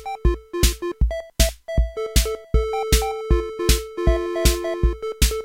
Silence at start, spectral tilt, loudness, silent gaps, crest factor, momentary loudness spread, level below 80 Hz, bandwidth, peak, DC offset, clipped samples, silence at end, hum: 0 s; -4.5 dB/octave; -22 LUFS; none; 20 dB; 4 LU; -22 dBFS; 16.5 kHz; -2 dBFS; under 0.1%; under 0.1%; 0 s; none